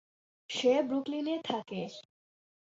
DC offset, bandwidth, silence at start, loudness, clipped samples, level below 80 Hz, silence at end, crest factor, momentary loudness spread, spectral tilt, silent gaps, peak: under 0.1%; 8 kHz; 0.5 s; -32 LUFS; under 0.1%; -80 dBFS; 0.8 s; 18 dB; 13 LU; -4.5 dB/octave; none; -16 dBFS